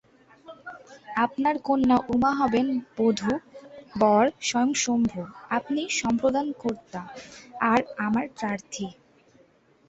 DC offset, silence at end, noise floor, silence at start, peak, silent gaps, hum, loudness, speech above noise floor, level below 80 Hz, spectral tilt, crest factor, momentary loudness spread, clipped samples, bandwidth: under 0.1%; 0.95 s; -60 dBFS; 0.5 s; -8 dBFS; none; none; -25 LUFS; 35 dB; -58 dBFS; -4 dB/octave; 18 dB; 20 LU; under 0.1%; 8.2 kHz